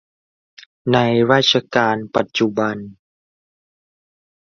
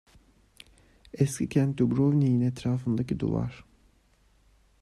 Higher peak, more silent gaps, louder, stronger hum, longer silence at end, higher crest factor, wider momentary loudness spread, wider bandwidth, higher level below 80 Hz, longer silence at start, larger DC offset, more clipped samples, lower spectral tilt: first, -2 dBFS vs -10 dBFS; neither; first, -17 LUFS vs -27 LUFS; neither; first, 1.5 s vs 1.2 s; about the same, 18 dB vs 18 dB; about the same, 9 LU vs 7 LU; second, 7.4 kHz vs 12.5 kHz; about the same, -58 dBFS vs -54 dBFS; second, 0.85 s vs 1.15 s; neither; neither; second, -5 dB/octave vs -7.5 dB/octave